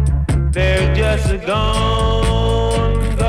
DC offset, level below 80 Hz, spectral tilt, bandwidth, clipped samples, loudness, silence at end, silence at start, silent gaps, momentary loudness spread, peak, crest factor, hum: under 0.1%; -18 dBFS; -6 dB/octave; 12.5 kHz; under 0.1%; -16 LUFS; 0 s; 0 s; none; 3 LU; -8 dBFS; 8 dB; none